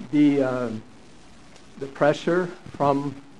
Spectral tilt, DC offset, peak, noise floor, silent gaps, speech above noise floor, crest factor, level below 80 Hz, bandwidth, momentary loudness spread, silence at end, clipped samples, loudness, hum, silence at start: -7 dB/octave; 0.5%; -6 dBFS; -50 dBFS; none; 27 dB; 18 dB; -60 dBFS; 10 kHz; 17 LU; 0.2 s; under 0.1%; -23 LUFS; none; 0 s